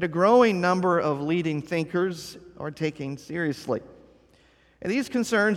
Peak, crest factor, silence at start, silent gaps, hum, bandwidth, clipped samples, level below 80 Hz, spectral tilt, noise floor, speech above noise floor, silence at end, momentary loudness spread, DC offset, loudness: -8 dBFS; 18 dB; 0 s; none; none; 15 kHz; under 0.1%; -62 dBFS; -6 dB/octave; -59 dBFS; 35 dB; 0 s; 17 LU; under 0.1%; -25 LUFS